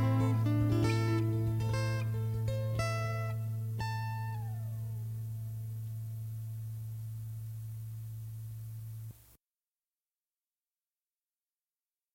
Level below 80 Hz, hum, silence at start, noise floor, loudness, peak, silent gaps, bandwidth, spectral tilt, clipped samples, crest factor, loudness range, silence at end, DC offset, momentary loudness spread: -56 dBFS; none; 0 s; under -90 dBFS; -36 LUFS; -18 dBFS; none; 16.5 kHz; -7 dB/octave; under 0.1%; 18 dB; 16 LU; 2.95 s; under 0.1%; 14 LU